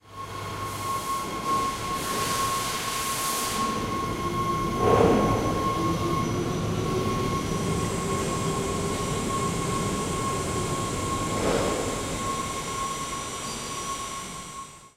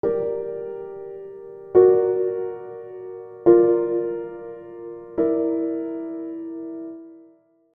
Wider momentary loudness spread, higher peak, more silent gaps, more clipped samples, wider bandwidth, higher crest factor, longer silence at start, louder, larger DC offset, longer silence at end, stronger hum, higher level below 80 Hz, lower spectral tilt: second, 7 LU vs 21 LU; about the same, -6 dBFS vs -4 dBFS; neither; neither; first, 16 kHz vs 2.5 kHz; about the same, 20 dB vs 20 dB; about the same, 0.05 s vs 0.05 s; second, -27 LUFS vs -22 LUFS; neither; second, 0.1 s vs 0.55 s; neither; first, -42 dBFS vs -62 dBFS; second, -4.5 dB/octave vs -12 dB/octave